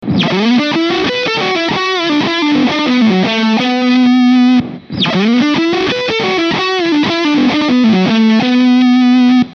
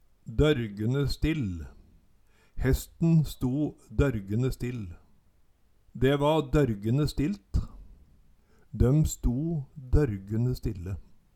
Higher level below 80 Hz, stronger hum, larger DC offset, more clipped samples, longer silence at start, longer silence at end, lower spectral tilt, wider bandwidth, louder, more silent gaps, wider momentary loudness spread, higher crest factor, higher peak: second, -50 dBFS vs -36 dBFS; neither; neither; neither; second, 0 s vs 0.25 s; second, 0 s vs 0.35 s; second, -5.5 dB/octave vs -7 dB/octave; second, 6.8 kHz vs 17.5 kHz; first, -11 LUFS vs -28 LUFS; neither; second, 5 LU vs 14 LU; second, 10 dB vs 18 dB; first, -2 dBFS vs -10 dBFS